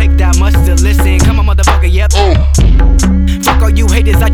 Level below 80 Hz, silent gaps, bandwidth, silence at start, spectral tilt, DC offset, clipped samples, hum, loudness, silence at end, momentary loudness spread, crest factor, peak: -8 dBFS; none; 15.5 kHz; 0 s; -5.5 dB/octave; under 0.1%; under 0.1%; none; -10 LUFS; 0 s; 1 LU; 6 dB; 0 dBFS